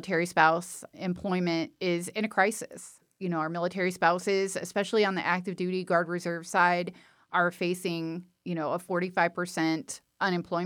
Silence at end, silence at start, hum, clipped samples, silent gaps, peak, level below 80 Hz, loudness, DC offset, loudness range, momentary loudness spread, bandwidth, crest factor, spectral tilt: 0 s; 0 s; none; under 0.1%; none; -8 dBFS; -72 dBFS; -29 LUFS; under 0.1%; 2 LU; 12 LU; 18 kHz; 22 dB; -5 dB/octave